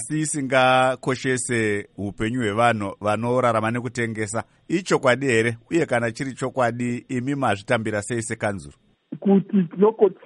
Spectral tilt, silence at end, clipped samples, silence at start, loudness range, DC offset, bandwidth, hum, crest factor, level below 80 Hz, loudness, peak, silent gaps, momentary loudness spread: -5 dB/octave; 0.1 s; under 0.1%; 0 s; 3 LU; under 0.1%; 11.5 kHz; none; 18 dB; -56 dBFS; -22 LUFS; -4 dBFS; none; 9 LU